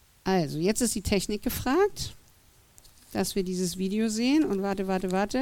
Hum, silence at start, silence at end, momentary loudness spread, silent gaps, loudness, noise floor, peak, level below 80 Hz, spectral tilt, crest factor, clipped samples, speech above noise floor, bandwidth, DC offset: none; 0.25 s; 0 s; 6 LU; none; -28 LUFS; -59 dBFS; -12 dBFS; -48 dBFS; -4.5 dB/octave; 16 dB; under 0.1%; 32 dB; 17.5 kHz; under 0.1%